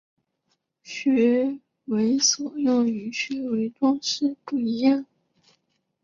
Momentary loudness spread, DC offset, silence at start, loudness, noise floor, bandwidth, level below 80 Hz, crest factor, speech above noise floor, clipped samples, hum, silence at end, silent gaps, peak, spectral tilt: 8 LU; under 0.1%; 0.85 s; -23 LUFS; -74 dBFS; 7.4 kHz; -70 dBFS; 16 dB; 51 dB; under 0.1%; none; 1 s; none; -8 dBFS; -3 dB/octave